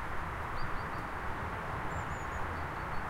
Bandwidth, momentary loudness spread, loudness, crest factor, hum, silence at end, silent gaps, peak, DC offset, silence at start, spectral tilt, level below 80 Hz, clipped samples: 16 kHz; 1 LU; -38 LUFS; 14 dB; none; 0 s; none; -22 dBFS; under 0.1%; 0 s; -5.5 dB/octave; -44 dBFS; under 0.1%